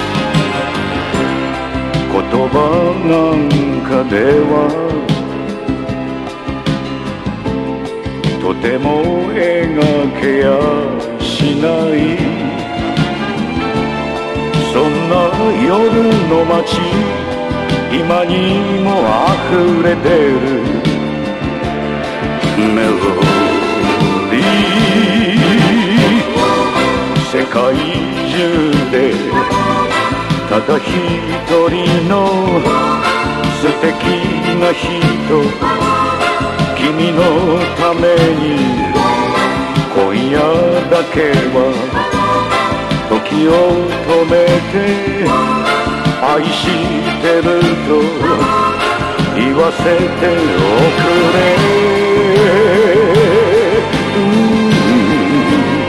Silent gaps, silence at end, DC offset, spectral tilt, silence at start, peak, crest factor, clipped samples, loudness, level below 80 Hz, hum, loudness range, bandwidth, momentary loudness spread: none; 0 s; under 0.1%; -6 dB/octave; 0 s; 0 dBFS; 12 dB; under 0.1%; -13 LUFS; -34 dBFS; none; 5 LU; 13.5 kHz; 7 LU